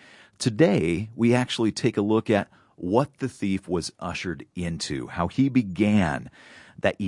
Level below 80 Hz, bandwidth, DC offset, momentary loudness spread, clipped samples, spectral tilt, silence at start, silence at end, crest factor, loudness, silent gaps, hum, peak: -56 dBFS; 11.5 kHz; under 0.1%; 10 LU; under 0.1%; -6 dB/octave; 0.4 s; 0 s; 20 dB; -25 LUFS; none; none; -4 dBFS